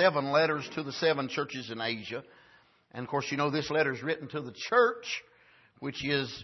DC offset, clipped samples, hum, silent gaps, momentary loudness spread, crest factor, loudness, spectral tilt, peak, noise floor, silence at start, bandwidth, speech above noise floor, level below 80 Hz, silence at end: under 0.1%; under 0.1%; none; none; 14 LU; 20 dB; -30 LUFS; -4.5 dB/octave; -10 dBFS; -62 dBFS; 0 s; 6.2 kHz; 32 dB; -68 dBFS; 0 s